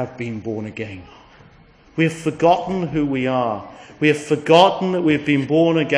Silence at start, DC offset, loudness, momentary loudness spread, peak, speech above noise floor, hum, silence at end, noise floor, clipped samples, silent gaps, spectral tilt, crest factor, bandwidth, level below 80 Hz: 0 s; under 0.1%; -18 LUFS; 16 LU; 0 dBFS; 30 dB; none; 0 s; -49 dBFS; under 0.1%; none; -6 dB/octave; 18 dB; 10.5 kHz; -52 dBFS